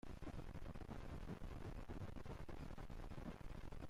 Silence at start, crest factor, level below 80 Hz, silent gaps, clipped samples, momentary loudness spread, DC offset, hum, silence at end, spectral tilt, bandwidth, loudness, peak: 0.05 s; 10 dB; -54 dBFS; none; under 0.1%; 2 LU; under 0.1%; none; 0 s; -7 dB/octave; 15.5 kHz; -55 LUFS; -42 dBFS